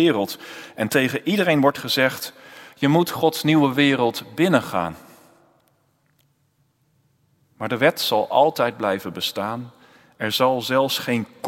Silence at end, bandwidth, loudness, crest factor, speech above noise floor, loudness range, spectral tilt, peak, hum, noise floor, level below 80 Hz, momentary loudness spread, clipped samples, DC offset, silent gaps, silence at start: 0 s; 16.5 kHz; -21 LUFS; 22 dB; 45 dB; 7 LU; -5 dB/octave; 0 dBFS; none; -65 dBFS; -66 dBFS; 11 LU; under 0.1%; under 0.1%; none; 0 s